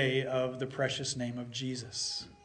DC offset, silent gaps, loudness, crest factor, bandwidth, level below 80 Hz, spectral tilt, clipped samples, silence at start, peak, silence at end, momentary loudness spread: under 0.1%; none; -34 LUFS; 18 dB; 10.5 kHz; -66 dBFS; -4 dB/octave; under 0.1%; 0 s; -16 dBFS; 0.1 s; 6 LU